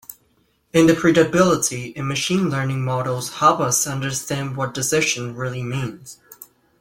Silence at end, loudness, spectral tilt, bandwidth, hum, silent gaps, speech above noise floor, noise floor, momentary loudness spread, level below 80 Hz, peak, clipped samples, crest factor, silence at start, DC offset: 0.35 s; -20 LUFS; -4.5 dB/octave; 16.5 kHz; none; none; 43 dB; -63 dBFS; 12 LU; -54 dBFS; -2 dBFS; under 0.1%; 18 dB; 0.1 s; under 0.1%